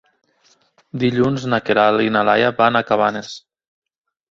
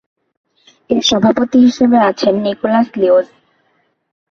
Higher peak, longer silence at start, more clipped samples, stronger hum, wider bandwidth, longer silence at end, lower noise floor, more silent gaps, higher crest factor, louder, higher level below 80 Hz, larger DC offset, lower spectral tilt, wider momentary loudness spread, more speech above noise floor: about the same, -2 dBFS vs -2 dBFS; about the same, 0.95 s vs 0.9 s; neither; neither; about the same, 7.8 kHz vs 7.2 kHz; about the same, 0.95 s vs 1.05 s; about the same, -58 dBFS vs -61 dBFS; neither; first, 18 dB vs 12 dB; second, -17 LUFS vs -12 LUFS; about the same, -56 dBFS vs -52 dBFS; neither; about the same, -6 dB/octave vs -5 dB/octave; first, 16 LU vs 5 LU; second, 42 dB vs 49 dB